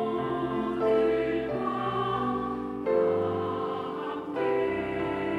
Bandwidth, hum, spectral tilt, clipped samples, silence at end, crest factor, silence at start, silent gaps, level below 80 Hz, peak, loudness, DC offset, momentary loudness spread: 9.2 kHz; none; -8 dB/octave; under 0.1%; 0 s; 14 dB; 0 s; none; -56 dBFS; -14 dBFS; -29 LUFS; under 0.1%; 7 LU